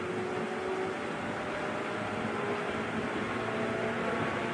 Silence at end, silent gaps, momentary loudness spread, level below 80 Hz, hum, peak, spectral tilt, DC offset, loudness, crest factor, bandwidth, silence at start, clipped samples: 0 s; none; 3 LU; -62 dBFS; none; -18 dBFS; -5.5 dB/octave; under 0.1%; -33 LUFS; 14 dB; 10.5 kHz; 0 s; under 0.1%